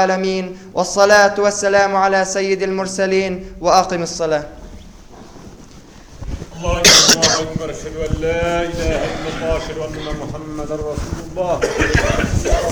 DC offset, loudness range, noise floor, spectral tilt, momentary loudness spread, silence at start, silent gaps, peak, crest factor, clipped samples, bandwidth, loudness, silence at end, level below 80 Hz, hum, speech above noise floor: 0.3%; 8 LU; -40 dBFS; -3 dB/octave; 16 LU; 0 s; none; 0 dBFS; 18 dB; under 0.1%; over 20 kHz; -16 LUFS; 0 s; -30 dBFS; none; 23 dB